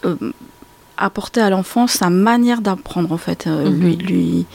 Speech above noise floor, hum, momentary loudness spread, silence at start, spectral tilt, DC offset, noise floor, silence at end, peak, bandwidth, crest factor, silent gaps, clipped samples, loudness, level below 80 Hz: 29 dB; none; 8 LU; 0.05 s; -5.5 dB/octave; under 0.1%; -45 dBFS; 0.1 s; -4 dBFS; 17 kHz; 14 dB; none; under 0.1%; -17 LUFS; -48 dBFS